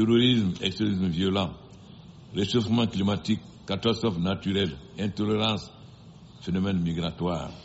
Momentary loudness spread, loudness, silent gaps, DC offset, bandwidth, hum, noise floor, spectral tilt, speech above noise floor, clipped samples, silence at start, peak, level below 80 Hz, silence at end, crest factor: 9 LU; -27 LUFS; none; under 0.1%; 8 kHz; none; -48 dBFS; -5 dB/octave; 22 dB; under 0.1%; 0 s; -10 dBFS; -52 dBFS; 0 s; 16 dB